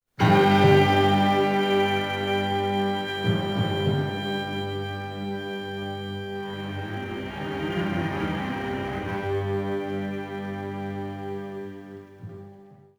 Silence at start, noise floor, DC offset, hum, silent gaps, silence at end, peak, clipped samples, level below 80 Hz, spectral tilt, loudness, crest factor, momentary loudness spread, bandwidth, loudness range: 0.2 s; -49 dBFS; under 0.1%; 50 Hz at -45 dBFS; none; 0.25 s; -6 dBFS; under 0.1%; -54 dBFS; -6.5 dB/octave; -25 LUFS; 20 dB; 15 LU; over 20 kHz; 10 LU